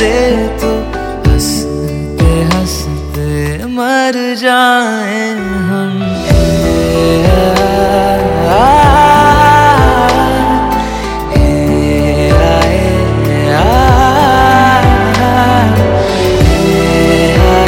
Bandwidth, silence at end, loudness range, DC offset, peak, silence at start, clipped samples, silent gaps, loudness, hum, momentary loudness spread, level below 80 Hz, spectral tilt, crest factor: 17 kHz; 0 s; 5 LU; under 0.1%; 0 dBFS; 0 s; 0.5%; none; -10 LUFS; none; 9 LU; -18 dBFS; -5.5 dB/octave; 8 dB